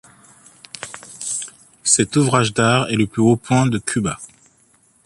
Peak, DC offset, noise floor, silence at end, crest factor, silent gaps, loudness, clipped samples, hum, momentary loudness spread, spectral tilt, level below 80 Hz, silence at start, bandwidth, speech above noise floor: -2 dBFS; under 0.1%; -57 dBFS; 0.8 s; 18 dB; none; -18 LUFS; under 0.1%; none; 17 LU; -4.5 dB/octave; -52 dBFS; 0.8 s; 11.5 kHz; 40 dB